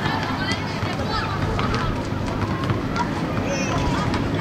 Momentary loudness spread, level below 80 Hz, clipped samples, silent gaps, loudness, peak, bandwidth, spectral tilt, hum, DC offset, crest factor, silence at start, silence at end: 3 LU; -36 dBFS; under 0.1%; none; -24 LUFS; -4 dBFS; 14 kHz; -5.5 dB/octave; none; under 0.1%; 18 dB; 0 s; 0 s